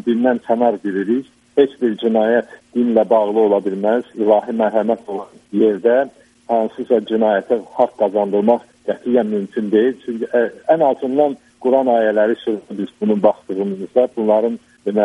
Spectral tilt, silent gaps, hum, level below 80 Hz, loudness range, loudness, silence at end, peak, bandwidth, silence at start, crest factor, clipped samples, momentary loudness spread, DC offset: -8 dB/octave; none; none; -64 dBFS; 2 LU; -17 LUFS; 0 s; 0 dBFS; 11 kHz; 0.05 s; 16 dB; under 0.1%; 8 LU; under 0.1%